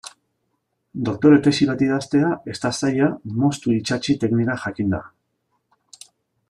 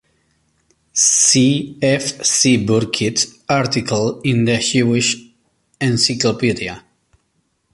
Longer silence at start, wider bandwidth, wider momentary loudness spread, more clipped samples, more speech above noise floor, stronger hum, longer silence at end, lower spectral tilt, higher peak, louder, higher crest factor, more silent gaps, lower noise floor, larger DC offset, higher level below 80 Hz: second, 0.05 s vs 0.95 s; about the same, 11 kHz vs 11.5 kHz; about the same, 11 LU vs 9 LU; neither; about the same, 53 dB vs 50 dB; neither; first, 1.4 s vs 0.95 s; first, -6 dB/octave vs -3.5 dB/octave; about the same, -2 dBFS vs 0 dBFS; second, -20 LUFS vs -15 LUFS; about the same, 18 dB vs 16 dB; neither; first, -73 dBFS vs -66 dBFS; neither; about the same, -56 dBFS vs -52 dBFS